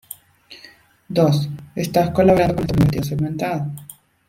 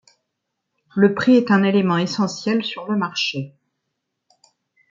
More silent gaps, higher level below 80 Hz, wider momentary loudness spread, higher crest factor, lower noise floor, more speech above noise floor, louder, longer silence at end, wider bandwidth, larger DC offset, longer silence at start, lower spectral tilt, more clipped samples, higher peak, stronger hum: neither; first, -42 dBFS vs -68 dBFS; first, 15 LU vs 10 LU; about the same, 18 dB vs 18 dB; second, -48 dBFS vs -78 dBFS; second, 30 dB vs 60 dB; about the same, -19 LUFS vs -19 LUFS; second, 0.35 s vs 1.45 s; first, 16.5 kHz vs 7.6 kHz; neither; second, 0.5 s vs 0.95 s; about the same, -7 dB/octave vs -6 dB/octave; neither; about the same, -2 dBFS vs -4 dBFS; neither